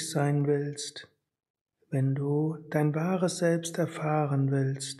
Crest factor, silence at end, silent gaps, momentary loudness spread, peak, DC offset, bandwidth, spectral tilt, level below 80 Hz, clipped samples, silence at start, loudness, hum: 16 dB; 0 s; 1.50-1.54 s, 1.61-1.66 s; 8 LU; -12 dBFS; under 0.1%; 12.5 kHz; -6 dB/octave; -76 dBFS; under 0.1%; 0 s; -29 LUFS; none